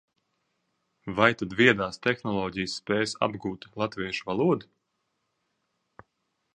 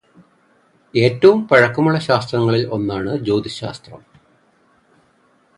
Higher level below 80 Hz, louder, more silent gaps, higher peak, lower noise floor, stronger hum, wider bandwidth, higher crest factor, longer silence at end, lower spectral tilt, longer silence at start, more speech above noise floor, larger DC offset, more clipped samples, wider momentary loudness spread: second, -60 dBFS vs -52 dBFS; second, -27 LUFS vs -16 LUFS; neither; about the same, -2 dBFS vs 0 dBFS; first, -78 dBFS vs -57 dBFS; neither; about the same, 10.5 kHz vs 11 kHz; first, 28 dB vs 18 dB; first, 1.95 s vs 1.6 s; second, -5 dB/octave vs -7 dB/octave; about the same, 1.05 s vs 0.95 s; first, 51 dB vs 41 dB; neither; neither; second, 12 LU vs 15 LU